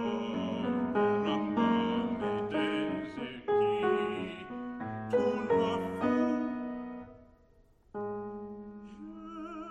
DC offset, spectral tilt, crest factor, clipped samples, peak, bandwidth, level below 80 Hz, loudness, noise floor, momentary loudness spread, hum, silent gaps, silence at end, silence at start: under 0.1%; -7 dB/octave; 16 dB; under 0.1%; -18 dBFS; 8.8 kHz; -64 dBFS; -32 LUFS; -63 dBFS; 16 LU; none; none; 0 s; 0 s